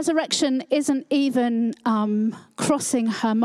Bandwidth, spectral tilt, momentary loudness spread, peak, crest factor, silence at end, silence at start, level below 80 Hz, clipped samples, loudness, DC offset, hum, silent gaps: 14 kHz; -4 dB/octave; 2 LU; -6 dBFS; 14 dB; 0 s; 0 s; -72 dBFS; under 0.1%; -22 LUFS; under 0.1%; none; none